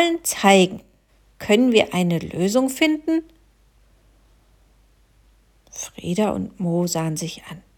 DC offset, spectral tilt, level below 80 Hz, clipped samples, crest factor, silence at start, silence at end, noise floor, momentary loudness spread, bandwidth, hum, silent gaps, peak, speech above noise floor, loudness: under 0.1%; -4.5 dB/octave; -56 dBFS; under 0.1%; 20 dB; 0 s; 0.2 s; -57 dBFS; 18 LU; 19 kHz; none; none; -4 dBFS; 37 dB; -20 LUFS